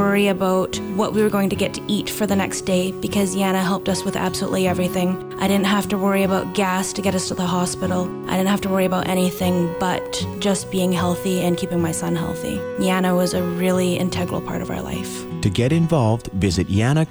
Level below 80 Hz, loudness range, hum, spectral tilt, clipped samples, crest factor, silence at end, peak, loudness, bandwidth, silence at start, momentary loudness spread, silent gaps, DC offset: -44 dBFS; 1 LU; none; -5.5 dB/octave; under 0.1%; 16 dB; 0 s; -4 dBFS; -21 LUFS; over 20 kHz; 0 s; 6 LU; none; under 0.1%